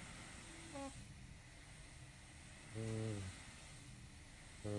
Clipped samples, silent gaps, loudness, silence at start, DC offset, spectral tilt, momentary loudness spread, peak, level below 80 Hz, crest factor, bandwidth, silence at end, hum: under 0.1%; none; -52 LUFS; 0 s; under 0.1%; -5 dB/octave; 13 LU; -32 dBFS; -64 dBFS; 20 dB; 11.5 kHz; 0 s; none